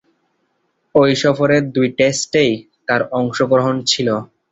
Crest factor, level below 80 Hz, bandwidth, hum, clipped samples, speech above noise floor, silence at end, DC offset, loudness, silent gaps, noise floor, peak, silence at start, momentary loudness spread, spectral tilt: 16 dB; -54 dBFS; 8.4 kHz; none; under 0.1%; 51 dB; 0.25 s; under 0.1%; -16 LUFS; none; -66 dBFS; -2 dBFS; 0.95 s; 6 LU; -4.5 dB/octave